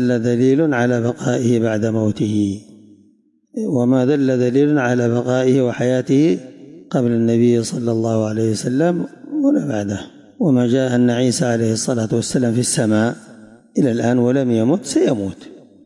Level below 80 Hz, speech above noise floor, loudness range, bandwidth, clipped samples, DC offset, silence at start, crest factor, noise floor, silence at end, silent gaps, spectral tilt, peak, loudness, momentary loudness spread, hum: -60 dBFS; 40 dB; 2 LU; 11.5 kHz; under 0.1%; under 0.1%; 0 s; 12 dB; -56 dBFS; 0.25 s; none; -6 dB/octave; -4 dBFS; -17 LUFS; 8 LU; none